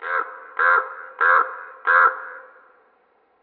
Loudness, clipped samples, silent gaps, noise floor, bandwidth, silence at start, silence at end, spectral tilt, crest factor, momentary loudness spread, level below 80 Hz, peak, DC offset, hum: -19 LUFS; under 0.1%; none; -61 dBFS; 4.5 kHz; 0 s; 1 s; -3 dB/octave; 18 dB; 17 LU; under -90 dBFS; -4 dBFS; under 0.1%; none